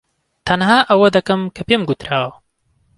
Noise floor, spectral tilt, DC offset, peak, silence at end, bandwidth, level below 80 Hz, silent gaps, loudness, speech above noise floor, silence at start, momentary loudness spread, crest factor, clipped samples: -62 dBFS; -5.5 dB/octave; under 0.1%; 0 dBFS; 0.65 s; 11.5 kHz; -48 dBFS; none; -15 LUFS; 47 dB; 0.45 s; 9 LU; 16 dB; under 0.1%